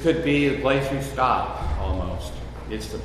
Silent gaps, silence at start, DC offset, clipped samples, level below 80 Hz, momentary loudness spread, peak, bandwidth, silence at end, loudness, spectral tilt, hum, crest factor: none; 0 s; under 0.1%; under 0.1%; -32 dBFS; 13 LU; -6 dBFS; 13.5 kHz; 0 s; -24 LUFS; -6 dB/octave; none; 16 dB